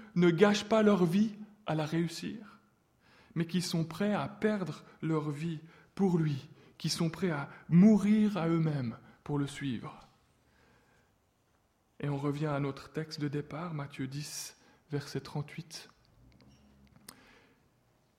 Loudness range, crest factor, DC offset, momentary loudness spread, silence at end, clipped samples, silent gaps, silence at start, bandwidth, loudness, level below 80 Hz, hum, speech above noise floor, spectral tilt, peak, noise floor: 13 LU; 22 dB; under 0.1%; 16 LU; 2.3 s; under 0.1%; none; 0 s; 15 kHz; -32 LUFS; -68 dBFS; none; 41 dB; -6.5 dB/octave; -10 dBFS; -72 dBFS